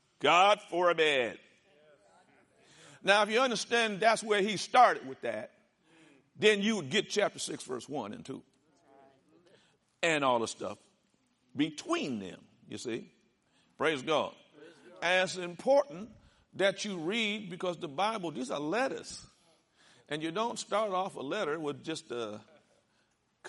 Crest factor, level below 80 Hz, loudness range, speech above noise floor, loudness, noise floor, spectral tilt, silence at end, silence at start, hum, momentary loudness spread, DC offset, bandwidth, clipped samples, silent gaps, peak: 24 dB; -78 dBFS; 8 LU; 43 dB; -31 LUFS; -74 dBFS; -3.5 dB/octave; 0 s; 0.2 s; none; 16 LU; under 0.1%; 11.5 kHz; under 0.1%; none; -8 dBFS